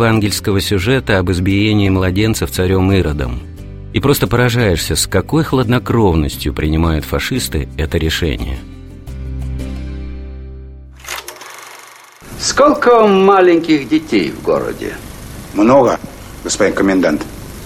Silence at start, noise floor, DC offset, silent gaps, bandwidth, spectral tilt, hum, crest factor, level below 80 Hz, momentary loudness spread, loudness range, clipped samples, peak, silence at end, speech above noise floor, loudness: 0 s; -38 dBFS; under 0.1%; none; 16.5 kHz; -5.5 dB/octave; none; 14 dB; -28 dBFS; 21 LU; 12 LU; under 0.1%; 0 dBFS; 0 s; 25 dB; -14 LUFS